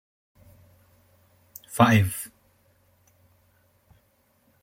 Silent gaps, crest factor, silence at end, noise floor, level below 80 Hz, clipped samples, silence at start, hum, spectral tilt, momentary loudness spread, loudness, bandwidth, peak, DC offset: none; 24 dB; 2.35 s; -66 dBFS; -62 dBFS; under 0.1%; 1.7 s; none; -5.5 dB/octave; 28 LU; -22 LUFS; 16.5 kHz; -4 dBFS; under 0.1%